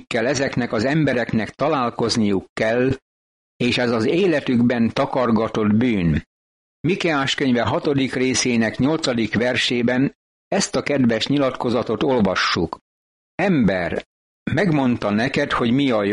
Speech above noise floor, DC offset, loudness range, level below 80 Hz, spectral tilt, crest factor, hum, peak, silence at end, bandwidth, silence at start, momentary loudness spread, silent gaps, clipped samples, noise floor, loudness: over 71 dB; under 0.1%; 2 LU; -46 dBFS; -5 dB/octave; 12 dB; none; -8 dBFS; 0 s; 11 kHz; 0.1 s; 5 LU; 2.49-2.56 s, 3.02-3.60 s, 6.26-6.84 s, 10.15-10.51 s, 12.81-13.38 s, 14.06-14.46 s; under 0.1%; under -90 dBFS; -20 LUFS